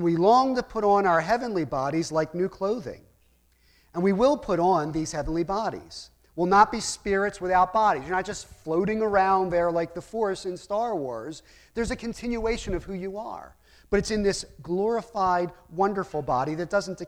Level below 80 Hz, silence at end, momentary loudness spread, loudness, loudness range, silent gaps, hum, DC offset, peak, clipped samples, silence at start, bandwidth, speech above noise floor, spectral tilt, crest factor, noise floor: -48 dBFS; 0 s; 13 LU; -25 LUFS; 6 LU; none; none; under 0.1%; -6 dBFS; under 0.1%; 0 s; 14 kHz; 38 dB; -5.5 dB/octave; 20 dB; -63 dBFS